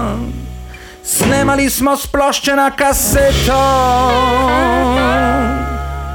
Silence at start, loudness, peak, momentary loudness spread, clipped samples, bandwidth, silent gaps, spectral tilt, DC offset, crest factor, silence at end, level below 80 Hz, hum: 0 s; -13 LUFS; -4 dBFS; 12 LU; under 0.1%; 19.5 kHz; none; -4 dB/octave; under 0.1%; 10 dB; 0 s; -24 dBFS; none